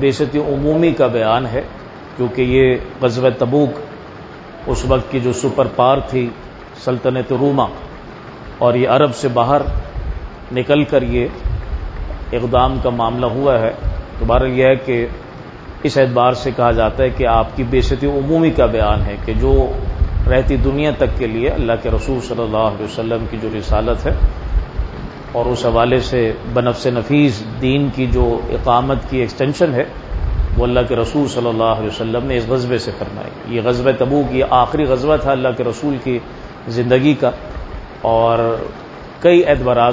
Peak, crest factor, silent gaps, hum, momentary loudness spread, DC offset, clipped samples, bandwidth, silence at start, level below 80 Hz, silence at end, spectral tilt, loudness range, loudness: 0 dBFS; 16 dB; none; none; 13 LU; under 0.1%; under 0.1%; 8 kHz; 0 s; -24 dBFS; 0 s; -7 dB/octave; 3 LU; -16 LUFS